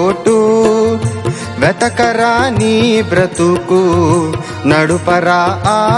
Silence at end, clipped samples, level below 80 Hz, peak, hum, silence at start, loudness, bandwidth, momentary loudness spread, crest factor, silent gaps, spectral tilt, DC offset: 0 s; under 0.1%; -42 dBFS; 0 dBFS; none; 0 s; -12 LUFS; 11.5 kHz; 5 LU; 12 dB; none; -5.5 dB/octave; under 0.1%